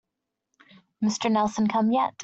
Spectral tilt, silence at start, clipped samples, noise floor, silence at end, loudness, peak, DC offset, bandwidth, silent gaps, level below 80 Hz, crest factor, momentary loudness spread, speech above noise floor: -5 dB/octave; 1 s; under 0.1%; -84 dBFS; 0 s; -24 LUFS; -10 dBFS; under 0.1%; 8 kHz; none; -66 dBFS; 16 dB; 5 LU; 60 dB